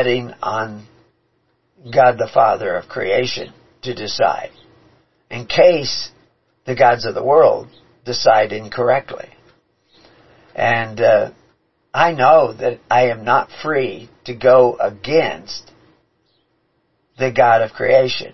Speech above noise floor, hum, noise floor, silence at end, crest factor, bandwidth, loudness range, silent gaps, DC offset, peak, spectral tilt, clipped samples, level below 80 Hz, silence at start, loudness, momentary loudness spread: 49 dB; none; -65 dBFS; 0 s; 18 dB; 6.2 kHz; 4 LU; none; 0.5%; 0 dBFS; -5 dB/octave; under 0.1%; -54 dBFS; 0 s; -16 LUFS; 19 LU